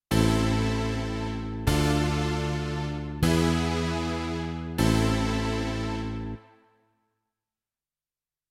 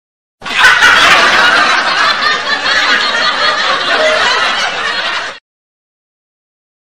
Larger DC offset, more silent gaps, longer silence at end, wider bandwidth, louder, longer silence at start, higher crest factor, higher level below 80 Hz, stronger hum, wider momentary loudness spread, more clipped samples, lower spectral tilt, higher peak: second, under 0.1% vs 1%; neither; first, 2.1 s vs 1.55 s; second, 16 kHz vs over 20 kHz; second, -27 LUFS vs -9 LUFS; second, 0.1 s vs 0.4 s; first, 18 dB vs 12 dB; first, -36 dBFS vs -46 dBFS; neither; about the same, 9 LU vs 9 LU; second, under 0.1% vs 0.9%; first, -6 dB/octave vs -0.5 dB/octave; second, -10 dBFS vs 0 dBFS